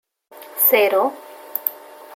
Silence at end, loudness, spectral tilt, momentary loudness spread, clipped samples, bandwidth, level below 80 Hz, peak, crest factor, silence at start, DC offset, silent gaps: 0 s; -18 LUFS; -1 dB/octave; 18 LU; under 0.1%; 17 kHz; -82 dBFS; 0 dBFS; 20 dB; 0.4 s; under 0.1%; none